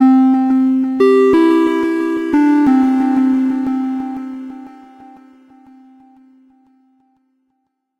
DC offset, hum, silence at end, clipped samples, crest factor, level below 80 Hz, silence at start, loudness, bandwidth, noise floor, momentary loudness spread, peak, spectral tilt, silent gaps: under 0.1%; none; 3.3 s; under 0.1%; 12 dB; -56 dBFS; 0 s; -13 LUFS; 7 kHz; -70 dBFS; 15 LU; -2 dBFS; -6.5 dB/octave; none